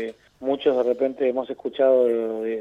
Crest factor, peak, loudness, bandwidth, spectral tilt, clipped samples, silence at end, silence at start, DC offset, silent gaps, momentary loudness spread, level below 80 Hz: 14 dB; -8 dBFS; -23 LUFS; 5.4 kHz; -6.5 dB/octave; under 0.1%; 0 s; 0 s; under 0.1%; none; 12 LU; -68 dBFS